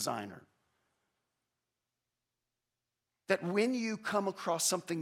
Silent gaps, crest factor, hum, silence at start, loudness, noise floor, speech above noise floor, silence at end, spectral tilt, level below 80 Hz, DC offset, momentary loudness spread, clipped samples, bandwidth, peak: none; 22 dB; none; 0 s; -33 LUFS; -89 dBFS; 55 dB; 0 s; -3.5 dB/octave; -88 dBFS; under 0.1%; 7 LU; under 0.1%; 16 kHz; -16 dBFS